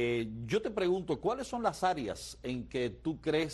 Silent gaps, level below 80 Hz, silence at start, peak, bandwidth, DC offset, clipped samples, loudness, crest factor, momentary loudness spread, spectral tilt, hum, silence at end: none; -56 dBFS; 0 s; -16 dBFS; 12.5 kHz; under 0.1%; under 0.1%; -34 LUFS; 18 dB; 7 LU; -5.5 dB/octave; none; 0 s